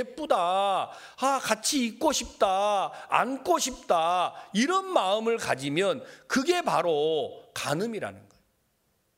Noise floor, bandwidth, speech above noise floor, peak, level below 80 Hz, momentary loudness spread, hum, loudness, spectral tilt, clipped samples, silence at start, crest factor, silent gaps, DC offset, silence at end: -72 dBFS; 16 kHz; 45 dB; -6 dBFS; -62 dBFS; 6 LU; none; -27 LUFS; -3 dB/octave; under 0.1%; 0 s; 20 dB; none; under 0.1%; 0.95 s